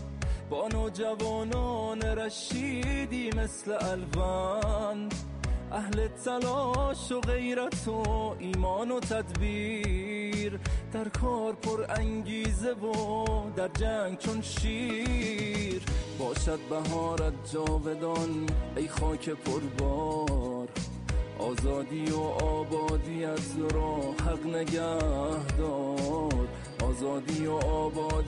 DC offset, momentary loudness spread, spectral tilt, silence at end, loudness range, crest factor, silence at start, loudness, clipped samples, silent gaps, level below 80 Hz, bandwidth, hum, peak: under 0.1%; 4 LU; -5.5 dB/octave; 0 s; 1 LU; 12 dB; 0 s; -32 LUFS; under 0.1%; none; -36 dBFS; 11.5 kHz; none; -20 dBFS